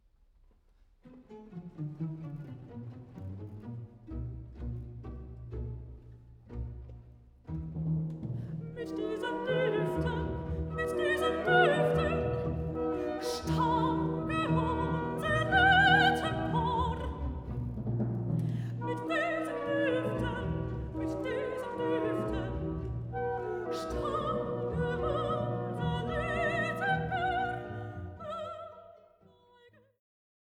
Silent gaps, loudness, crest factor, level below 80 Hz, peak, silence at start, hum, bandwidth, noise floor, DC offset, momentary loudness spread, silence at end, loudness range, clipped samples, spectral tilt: none; -32 LUFS; 20 dB; -46 dBFS; -12 dBFS; 1.05 s; none; 15 kHz; -64 dBFS; under 0.1%; 17 LU; 1.45 s; 16 LU; under 0.1%; -6.5 dB/octave